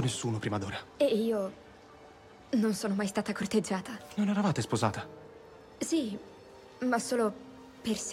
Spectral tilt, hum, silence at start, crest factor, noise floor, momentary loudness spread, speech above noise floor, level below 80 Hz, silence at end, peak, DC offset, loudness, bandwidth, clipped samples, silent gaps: -5 dB/octave; none; 0 s; 20 dB; -54 dBFS; 22 LU; 23 dB; -66 dBFS; 0 s; -12 dBFS; under 0.1%; -32 LUFS; 15.5 kHz; under 0.1%; none